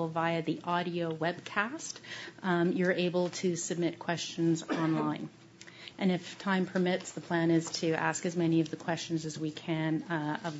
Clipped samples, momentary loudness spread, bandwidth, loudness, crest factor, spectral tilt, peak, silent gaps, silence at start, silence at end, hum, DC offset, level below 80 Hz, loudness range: under 0.1%; 8 LU; 8 kHz; -32 LUFS; 20 dB; -5 dB/octave; -12 dBFS; none; 0 s; 0 s; none; under 0.1%; -76 dBFS; 2 LU